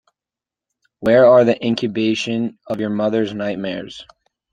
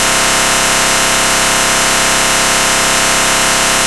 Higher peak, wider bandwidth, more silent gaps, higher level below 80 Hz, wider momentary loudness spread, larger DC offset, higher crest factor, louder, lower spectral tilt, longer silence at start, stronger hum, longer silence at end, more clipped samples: about the same, -2 dBFS vs 0 dBFS; second, 9.2 kHz vs 11 kHz; neither; second, -58 dBFS vs -32 dBFS; first, 15 LU vs 0 LU; second, under 0.1% vs 2%; first, 18 dB vs 12 dB; second, -17 LUFS vs -9 LUFS; first, -6 dB/octave vs -0.5 dB/octave; first, 1 s vs 0 s; neither; first, 0.5 s vs 0 s; second, under 0.1% vs 0.2%